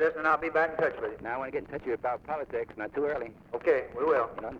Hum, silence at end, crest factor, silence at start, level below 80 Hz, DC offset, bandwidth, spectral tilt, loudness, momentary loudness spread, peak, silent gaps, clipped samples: none; 0 s; 16 dB; 0 s; -60 dBFS; under 0.1%; 6.6 kHz; -7 dB/octave; -30 LUFS; 9 LU; -14 dBFS; none; under 0.1%